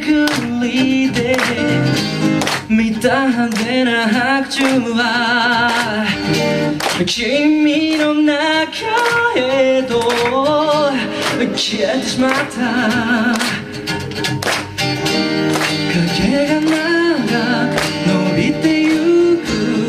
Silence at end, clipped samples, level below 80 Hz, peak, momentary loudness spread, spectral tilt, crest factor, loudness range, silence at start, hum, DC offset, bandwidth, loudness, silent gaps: 0 s; under 0.1%; -46 dBFS; 0 dBFS; 4 LU; -4.5 dB/octave; 16 dB; 2 LU; 0 s; none; under 0.1%; 15.5 kHz; -15 LUFS; none